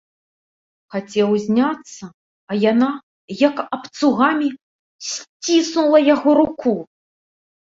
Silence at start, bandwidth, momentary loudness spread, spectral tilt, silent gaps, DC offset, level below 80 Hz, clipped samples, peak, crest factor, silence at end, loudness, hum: 0.95 s; 7.8 kHz; 15 LU; -4.5 dB/octave; 2.14-2.47 s, 3.03-3.28 s, 4.62-4.99 s, 5.29-5.40 s; under 0.1%; -62 dBFS; under 0.1%; -2 dBFS; 18 dB; 0.85 s; -18 LUFS; none